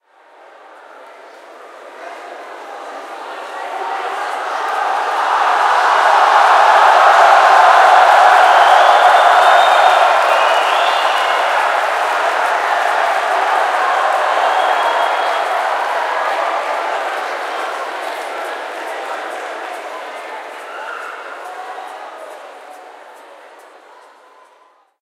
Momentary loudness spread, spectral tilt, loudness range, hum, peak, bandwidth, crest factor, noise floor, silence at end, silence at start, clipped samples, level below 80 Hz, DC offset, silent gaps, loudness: 21 LU; 1.5 dB/octave; 21 LU; none; 0 dBFS; 15.5 kHz; 14 dB; -51 dBFS; 1.65 s; 0.95 s; under 0.1%; -78 dBFS; under 0.1%; none; -12 LUFS